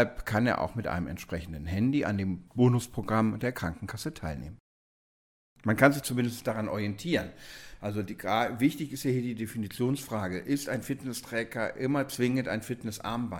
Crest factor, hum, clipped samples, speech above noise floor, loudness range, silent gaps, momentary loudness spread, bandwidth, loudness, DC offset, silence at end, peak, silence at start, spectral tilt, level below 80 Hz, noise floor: 24 dB; none; under 0.1%; over 60 dB; 2 LU; 4.60-5.56 s; 11 LU; 17 kHz; -30 LUFS; under 0.1%; 0 s; -8 dBFS; 0 s; -6 dB/octave; -52 dBFS; under -90 dBFS